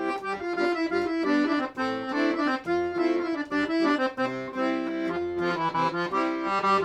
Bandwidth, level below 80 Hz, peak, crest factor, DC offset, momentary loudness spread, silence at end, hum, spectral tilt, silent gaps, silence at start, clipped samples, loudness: 9.4 kHz; -64 dBFS; -12 dBFS; 14 dB; under 0.1%; 5 LU; 0 s; none; -5.5 dB/octave; none; 0 s; under 0.1%; -27 LUFS